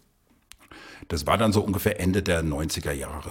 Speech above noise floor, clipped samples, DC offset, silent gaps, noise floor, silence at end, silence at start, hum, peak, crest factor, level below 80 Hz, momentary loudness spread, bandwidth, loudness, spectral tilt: 39 dB; under 0.1%; under 0.1%; none; -64 dBFS; 0 s; 0.7 s; none; -6 dBFS; 20 dB; -40 dBFS; 18 LU; 17 kHz; -25 LUFS; -5 dB/octave